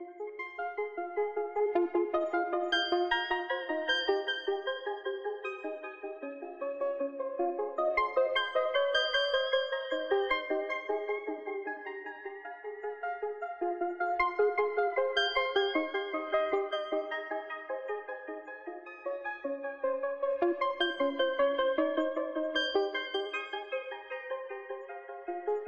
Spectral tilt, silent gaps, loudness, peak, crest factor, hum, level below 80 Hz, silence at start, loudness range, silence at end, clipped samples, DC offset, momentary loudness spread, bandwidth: -2.5 dB/octave; none; -33 LUFS; -14 dBFS; 18 dB; none; -68 dBFS; 0 s; 6 LU; 0 s; under 0.1%; under 0.1%; 13 LU; 8.2 kHz